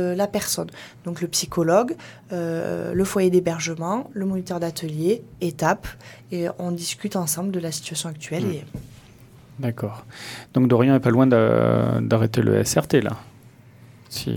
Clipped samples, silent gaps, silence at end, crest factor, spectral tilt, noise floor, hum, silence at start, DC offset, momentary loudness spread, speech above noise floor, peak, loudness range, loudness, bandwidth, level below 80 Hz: under 0.1%; none; 0 s; 20 dB; -5.5 dB/octave; -48 dBFS; none; 0 s; under 0.1%; 16 LU; 26 dB; -2 dBFS; 9 LU; -22 LUFS; 18.5 kHz; -52 dBFS